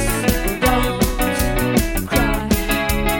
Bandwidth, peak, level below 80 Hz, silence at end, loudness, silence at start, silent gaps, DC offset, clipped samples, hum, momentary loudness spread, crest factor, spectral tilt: 17.5 kHz; -2 dBFS; -24 dBFS; 0 s; -18 LUFS; 0 s; none; under 0.1%; under 0.1%; none; 2 LU; 16 dB; -4.5 dB/octave